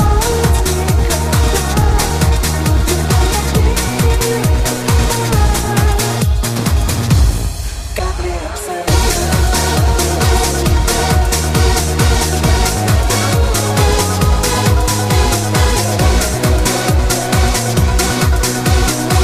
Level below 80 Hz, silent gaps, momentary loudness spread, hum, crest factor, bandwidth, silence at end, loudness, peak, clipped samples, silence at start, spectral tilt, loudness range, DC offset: -16 dBFS; none; 2 LU; none; 12 dB; 15.5 kHz; 0 s; -14 LUFS; 0 dBFS; under 0.1%; 0 s; -4.5 dB/octave; 2 LU; under 0.1%